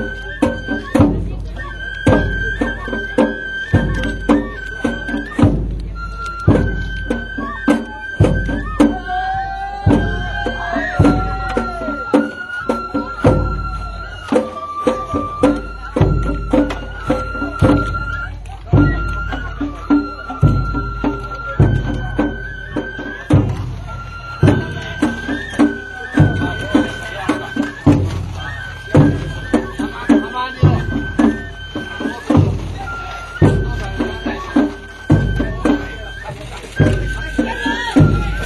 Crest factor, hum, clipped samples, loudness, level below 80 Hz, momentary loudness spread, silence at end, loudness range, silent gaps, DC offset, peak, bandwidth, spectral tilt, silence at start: 16 dB; none; under 0.1%; -18 LUFS; -26 dBFS; 11 LU; 0 s; 2 LU; none; under 0.1%; 0 dBFS; 12 kHz; -7.5 dB/octave; 0 s